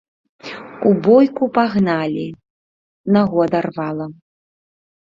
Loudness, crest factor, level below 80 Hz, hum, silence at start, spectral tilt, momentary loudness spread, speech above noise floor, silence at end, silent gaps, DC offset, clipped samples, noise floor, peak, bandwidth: -17 LUFS; 16 dB; -58 dBFS; none; 0.45 s; -9 dB/octave; 19 LU; over 74 dB; 1 s; 2.50-3.04 s; under 0.1%; under 0.1%; under -90 dBFS; -2 dBFS; 7 kHz